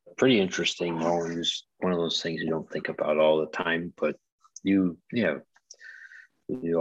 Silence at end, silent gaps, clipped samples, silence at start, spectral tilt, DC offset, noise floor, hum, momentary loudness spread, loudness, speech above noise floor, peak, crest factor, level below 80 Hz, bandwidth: 0 s; 4.32-4.38 s; under 0.1%; 0.05 s; -4.5 dB/octave; under 0.1%; -51 dBFS; none; 21 LU; -27 LUFS; 24 dB; -10 dBFS; 18 dB; -66 dBFS; 8.4 kHz